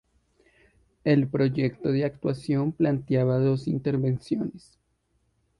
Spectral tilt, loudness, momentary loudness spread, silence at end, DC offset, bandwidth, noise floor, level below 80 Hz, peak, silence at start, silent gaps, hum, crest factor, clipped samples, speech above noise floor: -9 dB/octave; -26 LUFS; 7 LU; 1 s; under 0.1%; 11 kHz; -71 dBFS; -58 dBFS; -10 dBFS; 1.05 s; none; none; 18 dB; under 0.1%; 46 dB